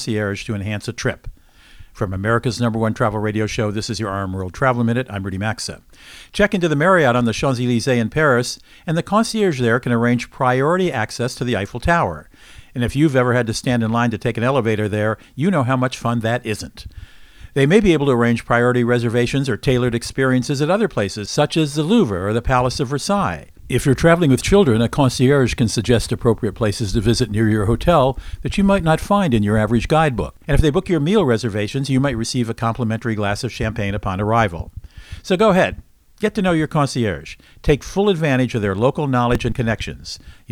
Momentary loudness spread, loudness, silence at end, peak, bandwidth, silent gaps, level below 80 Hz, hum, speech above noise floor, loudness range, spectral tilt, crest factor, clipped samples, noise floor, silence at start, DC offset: 9 LU; -18 LUFS; 0.2 s; 0 dBFS; 15.5 kHz; none; -34 dBFS; none; 26 dB; 4 LU; -6 dB/octave; 18 dB; under 0.1%; -44 dBFS; 0 s; under 0.1%